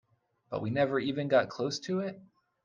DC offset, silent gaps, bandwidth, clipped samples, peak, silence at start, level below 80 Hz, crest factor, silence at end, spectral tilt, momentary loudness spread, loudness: under 0.1%; none; 9.4 kHz; under 0.1%; -12 dBFS; 0.5 s; -70 dBFS; 20 dB; 0.4 s; -5.5 dB/octave; 10 LU; -31 LUFS